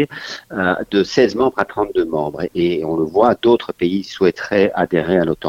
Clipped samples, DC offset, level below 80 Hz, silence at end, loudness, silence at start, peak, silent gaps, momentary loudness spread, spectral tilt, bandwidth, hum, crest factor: under 0.1%; under 0.1%; -48 dBFS; 0 s; -17 LUFS; 0 s; 0 dBFS; none; 6 LU; -6.5 dB/octave; 7.6 kHz; none; 16 dB